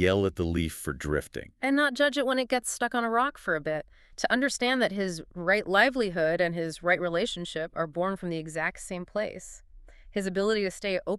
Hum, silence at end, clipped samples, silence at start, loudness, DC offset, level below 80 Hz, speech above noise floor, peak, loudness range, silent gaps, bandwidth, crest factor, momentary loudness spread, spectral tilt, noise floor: none; 0 s; under 0.1%; 0 s; -28 LUFS; under 0.1%; -50 dBFS; 22 dB; -8 dBFS; 5 LU; none; 13.5 kHz; 20 dB; 9 LU; -4.5 dB/octave; -50 dBFS